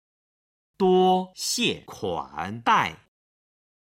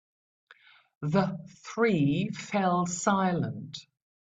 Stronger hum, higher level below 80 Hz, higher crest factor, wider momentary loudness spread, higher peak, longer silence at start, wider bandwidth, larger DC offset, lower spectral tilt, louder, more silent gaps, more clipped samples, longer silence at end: neither; about the same, -62 dBFS vs -66 dBFS; about the same, 20 dB vs 20 dB; second, 11 LU vs 15 LU; first, -6 dBFS vs -10 dBFS; second, 0.8 s vs 1 s; first, 16 kHz vs 9.2 kHz; neither; second, -4 dB/octave vs -5.5 dB/octave; first, -24 LUFS vs -28 LUFS; neither; neither; first, 0.85 s vs 0.4 s